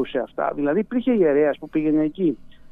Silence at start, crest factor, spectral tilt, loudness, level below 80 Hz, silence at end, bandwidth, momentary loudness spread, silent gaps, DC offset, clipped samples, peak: 0 s; 14 dB; -9.5 dB/octave; -22 LUFS; -52 dBFS; 0 s; 3.9 kHz; 7 LU; none; under 0.1%; under 0.1%; -8 dBFS